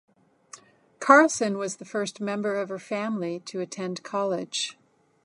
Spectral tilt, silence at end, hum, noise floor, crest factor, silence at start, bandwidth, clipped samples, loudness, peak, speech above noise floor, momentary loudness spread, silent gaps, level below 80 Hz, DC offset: -3.5 dB/octave; 0.55 s; none; -51 dBFS; 26 dB; 0.55 s; 11.5 kHz; under 0.1%; -26 LUFS; -2 dBFS; 26 dB; 15 LU; none; -80 dBFS; under 0.1%